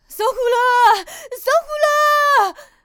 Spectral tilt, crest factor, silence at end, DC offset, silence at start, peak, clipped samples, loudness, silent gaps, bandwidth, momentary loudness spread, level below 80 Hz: 0.5 dB/octave; 12 dB; 0.2 s; under 0.1%; 0.1 s; -4 dBFS; under 0.1%; -16 LUFS; none; over 20 kHz; 9 LU; -54 dBFS